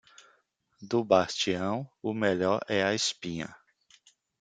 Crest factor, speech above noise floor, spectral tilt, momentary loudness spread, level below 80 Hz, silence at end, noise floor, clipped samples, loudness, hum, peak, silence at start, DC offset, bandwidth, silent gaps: 22 dB; 41 dB; -4 dB/octave; 11 LU; -70 dBFS; 0.85 s; -70 dBFS; under 0.1%; -29 LUFS; none; -8 dBFS; 0.8 s; under 0.1%; 9.6 kHz; none